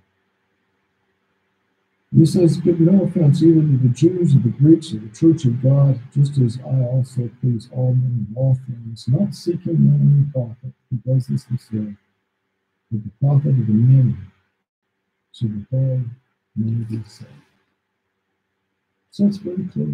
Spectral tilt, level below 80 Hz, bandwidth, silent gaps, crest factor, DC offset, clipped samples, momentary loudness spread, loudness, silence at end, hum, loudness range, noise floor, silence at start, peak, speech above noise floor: -9.5 dB/octave; -60 dBFS; 10.5 kHz; 14.69-14.82 s; 18 dB; under 0.1%; under 0.1%; 15 LU; -18 LUFS; 0 s; none; 11 LU; -74 dBFS; 2.1 s; 0 dBFS; 57 dB